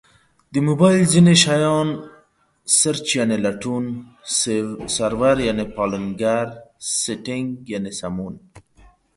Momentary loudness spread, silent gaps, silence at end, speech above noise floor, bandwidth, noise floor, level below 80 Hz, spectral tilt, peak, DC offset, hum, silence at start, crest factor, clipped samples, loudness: 15 LU; none; 0.6 s; 39 dB; 11.5 kHz; -58 dBFS; -50 dBFS; -4.5 dB/octave; 0 dBFS; under 0.1%; none; 0.5 s; 20 dB; under 0.1%; -19 LUFS